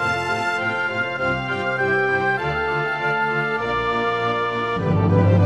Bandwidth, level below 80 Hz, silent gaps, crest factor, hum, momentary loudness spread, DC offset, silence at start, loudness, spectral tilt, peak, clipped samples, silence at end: 10 kHz; -46 dBFS; none; 14 dB; none; 4 LU; 0.2%; 0 s; -21 LUFS; -6.5 dB/octave; -6 dBFS; under 0.1%; 0 s